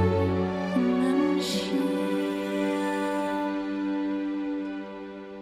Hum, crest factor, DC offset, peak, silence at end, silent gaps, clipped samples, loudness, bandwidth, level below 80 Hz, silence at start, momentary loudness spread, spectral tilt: none; 14 dB; under 0.1%; -12 dBFS; 0 s; none; under 0.1%; -27 LUFS; 14.5 kHz; -62 dBFS; 0 s; 9 LU; -6 dB/octave